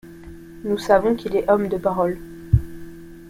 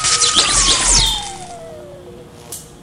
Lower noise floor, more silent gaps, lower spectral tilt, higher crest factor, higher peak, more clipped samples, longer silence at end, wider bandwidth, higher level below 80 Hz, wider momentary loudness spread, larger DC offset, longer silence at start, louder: about the same, -40 dBFS vs -37 dBFS; neither; first, -7.5 dB/octave vs 0 dB/octave; about the same, 20 dB vs 18 dB; about the same, -2 dBFS vs 0 dBFS; neither; about the same, 0 s vs 0.05 s; about the same, 16 kHz vs 16.5 kHz; second, -36 dBFS vs -30 dBFS; about the same, 23 LU vs 22 LU; neither; about the same, 0.05 s vs 0 s; second, -21 LUFS vs -12 LUFS